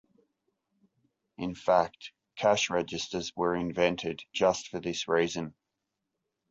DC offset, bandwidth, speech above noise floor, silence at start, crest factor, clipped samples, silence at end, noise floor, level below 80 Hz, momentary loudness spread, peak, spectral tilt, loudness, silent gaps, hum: under 0.1%; 8 kHz; 55 dB; 1.4 s; 22 dB; under 0.1%; 1 s; -85 dBFS; -62 dBFS; 12 LU; -10 dBFS; -4 dB/octave; -30 LUFS; none; none